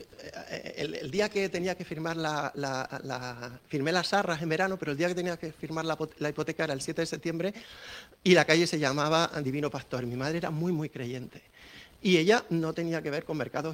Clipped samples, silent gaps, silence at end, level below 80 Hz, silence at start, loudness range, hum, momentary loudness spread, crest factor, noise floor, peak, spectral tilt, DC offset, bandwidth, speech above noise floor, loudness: under 0.1%; none; 0 s; -64 dBFS; 0 s; 5 LU; none; 15 LU; 24 dB; -52 dBFS; -6 dBFS; -5 dB/octave; under 0.1%; 16.5 kHz; 22 dB; -30 LUFS